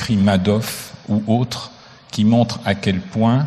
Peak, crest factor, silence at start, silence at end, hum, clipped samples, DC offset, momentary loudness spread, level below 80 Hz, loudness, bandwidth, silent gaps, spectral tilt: -2 dBFS; 16 dB; 0 s; 0 s; none; under 0.1%; under 0.1%; 13 LU; -50 dBFS; -19 LUFS; 14 kHz; none; -6.5 dB/octave